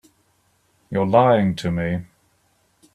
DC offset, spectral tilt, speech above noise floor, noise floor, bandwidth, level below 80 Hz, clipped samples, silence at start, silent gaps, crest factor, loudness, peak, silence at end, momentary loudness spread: under 0.1%; -7.5 dB/octave; 45 dB; -64 dBFS; 12 kHz; -52 dBFS; under 0.1%; 0.9 s; none; 20 dB; -20 LUFS; -2 dBFS; 0.9 s; 12 LU